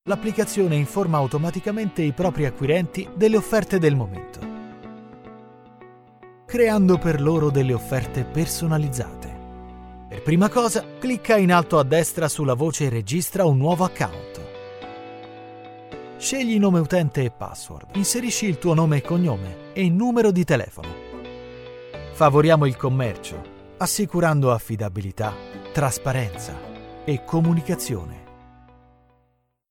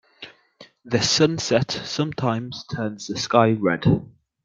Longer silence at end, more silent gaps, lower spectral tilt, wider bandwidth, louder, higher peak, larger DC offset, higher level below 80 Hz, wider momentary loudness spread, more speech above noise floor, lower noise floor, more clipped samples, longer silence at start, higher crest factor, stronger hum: first, 1.4 s vs 0.35 s; neither; about the same, -6 dB/octave vs -5 dB/octave; first, 17 kHz vs 9.4 kHz; about the same, -21 LUFS vs -22 LUFS; about the same, -4 dBFS vs -2 dBFS; neither; first, -46 dBFS vs -54 dBFS; first, 20 LU vs 12 LU; first, 46 dB vs 29 dB; first, -67 dBFS vs -51 dBFS; neither; second, 0.05 s vs 0.2 s; about the same, 20 dB vs 20 dB; neither